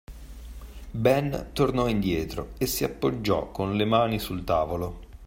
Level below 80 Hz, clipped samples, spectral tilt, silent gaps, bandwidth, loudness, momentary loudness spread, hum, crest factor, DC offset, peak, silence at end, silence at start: -42 dBFS; under 0.1%; -5.5 dB/octave; none; 16.5 kHz; -26 LUFS; 21 LU; none; 20 dB; under 0.1%; -8 dBFS; 0 s; 0.1 s